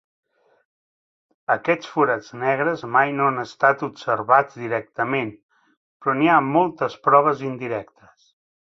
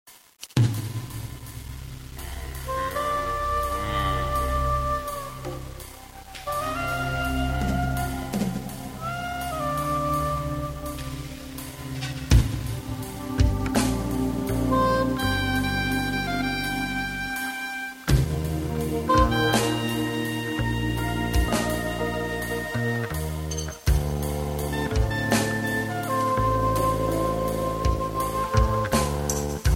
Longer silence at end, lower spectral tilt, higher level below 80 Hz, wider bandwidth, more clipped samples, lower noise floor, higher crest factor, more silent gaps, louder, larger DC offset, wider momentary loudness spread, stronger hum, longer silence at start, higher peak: first, 0.9 s vs 0 s; about the same, -6.5 dB/octave vs -5.5 dB/octave; second, -68 dBFS vs -32 dBFS; second, 7.6 kHz vs 16.5 kHz; neither; first, under -90 dBFS vs -47 dBFS; about the same, 20 dB vs 22 dB; first, 5.43-5.49 s, 5.77-6.00 s vs none; first, -21 LUFS vs -26 LUFS; neither; about the same, 10 LU vs 12 LU; neither; first, 1.5 s vs 0.05 s; about the same, -2 dBFS vs -4 dBFS